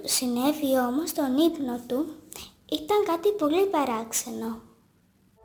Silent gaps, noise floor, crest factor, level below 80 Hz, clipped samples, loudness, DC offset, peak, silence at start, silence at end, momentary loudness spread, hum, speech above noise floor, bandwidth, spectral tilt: none; -63 dBFS; 16 dB; -62 dBFS; under 0.1%; -26 LUFS; under 0.1%; -10 dBFS; 0 s; 0.85 s; 12 LU; none; 37 dB; over 20 kHz; -2.5 dB/octave